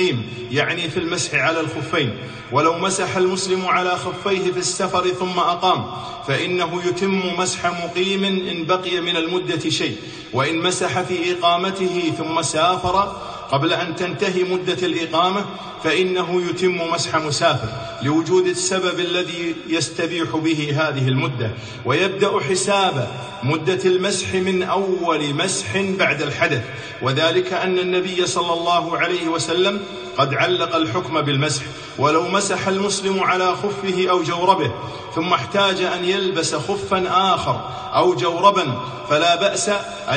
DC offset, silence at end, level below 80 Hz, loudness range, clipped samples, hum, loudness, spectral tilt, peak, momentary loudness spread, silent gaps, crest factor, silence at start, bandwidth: under 0.1%; 0 s; -54 dBFS; 2 LU; under 0.1%; none; -20 LUFS; -4 dB/octave; 0 dBFS; 6 LU; none; 20 dB; 0 s; 9.6 kHz